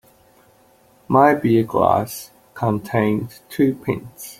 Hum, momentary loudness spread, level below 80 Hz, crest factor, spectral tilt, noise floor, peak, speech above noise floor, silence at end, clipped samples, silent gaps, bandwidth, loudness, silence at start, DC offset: none; 15 LU; -54 dBFS; 20 dB; -7 dB/octave; -54 dBFS; -2 dBFS; 36 dB; 0.05 s; under 0.1%; none; 16.5 kHz; -19 LUFS; 1.1 s; under 0.1%